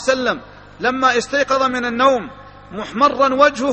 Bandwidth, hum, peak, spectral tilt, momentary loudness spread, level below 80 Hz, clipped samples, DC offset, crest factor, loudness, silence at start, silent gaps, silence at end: 8.8 kHz; 50 Hz at -45 dBFS; 0 dBFS; -3.5 dB/octave; 14 LU; -50 dBFS; under 0.1%; under 0.1%; 18 dB; -16 LUFS; 0 s; none; 0 s